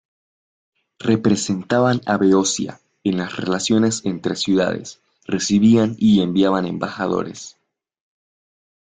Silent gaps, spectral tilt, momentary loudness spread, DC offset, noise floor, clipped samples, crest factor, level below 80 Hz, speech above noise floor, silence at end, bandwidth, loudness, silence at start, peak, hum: none; -5 dB/octave; 12 LU; under 0.1%; under -90 dBFS; under 0.1%; 16 dB; -56 dBFS; over 72 dB; 1.45 s; 9.4 kHz; -19 LUFS; 1 s; -4 dBFS; none